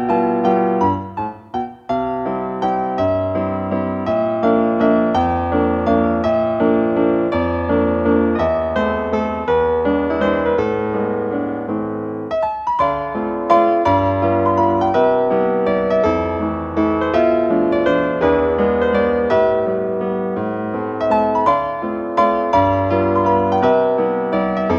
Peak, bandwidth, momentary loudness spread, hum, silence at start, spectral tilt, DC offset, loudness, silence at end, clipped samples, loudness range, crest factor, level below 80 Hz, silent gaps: -2 dBFS; 7 kHz; 7 LU; none; 0 s; -8.5 dB/octave; under 0.1%; -17 LUFS; 0 s; under 0.1%; 3 LU; 16 dB; -44 dBFS; none